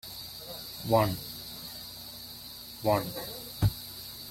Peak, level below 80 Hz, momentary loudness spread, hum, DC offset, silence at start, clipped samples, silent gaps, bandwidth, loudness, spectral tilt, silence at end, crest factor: -10 dBFS; -50 dBFS; 15 LU; 60 Hz at -55 dBFS; under 0.1%; 0.05 s; under 0.1%; none; 16.5 kHz; -33 LUFS; -5 dB/octave; 0 s; 22 dB